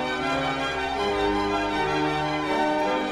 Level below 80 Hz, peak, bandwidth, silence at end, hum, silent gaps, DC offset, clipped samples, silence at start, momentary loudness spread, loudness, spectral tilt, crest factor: -46 dBFS; -12 dBFS; 13.5 kHz; 0 s; none; none; under 0.1%; under 0.1%; 0 s; 2 LU; -25 LUFS; -5 dB/octave; 12 dB